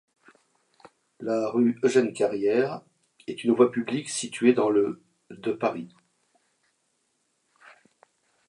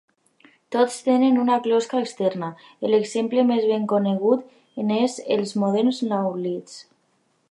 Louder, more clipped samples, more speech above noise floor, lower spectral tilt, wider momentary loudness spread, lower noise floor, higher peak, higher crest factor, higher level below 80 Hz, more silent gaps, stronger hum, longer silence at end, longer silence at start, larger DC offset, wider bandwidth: second, -25 LUFS vs -22 LUFS; neither; first, 49 dB vs 45 dB; about the same, -5 dB/octave vs -6 dB/octave; first, 17 LU vs 10 LU; first, -73 dBFS vs -67 dBFS; about the same, -6 dBFS vs -6 dBFS; first, 22 dB vs 16 dB; about the same, -76 dBFS vs -78 dBFS; neither; neither; first, 2.6 s vs 0.7 s; first, 1.2 s vs 0.7 s; neither; about the same, 11.5 kHz vs 11.5 kHz